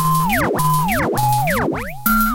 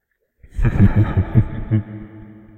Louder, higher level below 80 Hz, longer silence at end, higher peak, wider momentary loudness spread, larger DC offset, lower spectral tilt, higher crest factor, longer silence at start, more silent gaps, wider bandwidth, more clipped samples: about the same, -17 LUFS vs -18 LUFS; second, -32 dBFS vs -26 dBFS; second, 0 s vs 0.2 s; about the same, -2 dBFS vs 0 dBFS; second, 4 LU vs 21 LU; neither; second, -5 dB/octave vs -10.5 dB/octave; about the same, 16 dB vs 18 dB; second, 0 s vs 0.55 s; neither; first, 17.5 kHz vs 4 kHz; neither